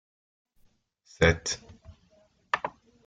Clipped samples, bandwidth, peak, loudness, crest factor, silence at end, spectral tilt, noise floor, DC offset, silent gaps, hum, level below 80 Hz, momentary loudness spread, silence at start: under 0.1%; 9.4 kHz; -6 dBFS; -28 LUFS; 26 dB; 0.35 s; -4 dB/octave; -65 dBFS; under 0.1%; none; none; -50 dBFS; 12 LU; 1.2 s